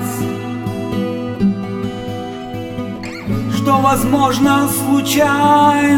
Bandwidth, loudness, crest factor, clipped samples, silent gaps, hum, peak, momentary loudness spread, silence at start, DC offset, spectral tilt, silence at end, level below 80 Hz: 20 kHz; -16 LUFS; 14 dB; under 0.1%; none; none; 0 dBFS; 14 LU; 0 s; under 0.1%; -5 dB/octave; 0 s; -40 dBFS